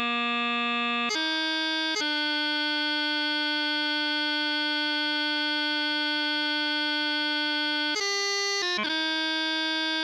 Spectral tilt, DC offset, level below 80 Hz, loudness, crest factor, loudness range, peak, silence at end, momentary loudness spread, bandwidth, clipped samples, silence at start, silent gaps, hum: 0 dB/octave; under 0.1%; -82 dBFS; -25 LUFS; 12 dB; 0 LU; -16 dBFS; 0 s; 0 LU; 13.5 kHz; under 0.1%; 0 s; none; none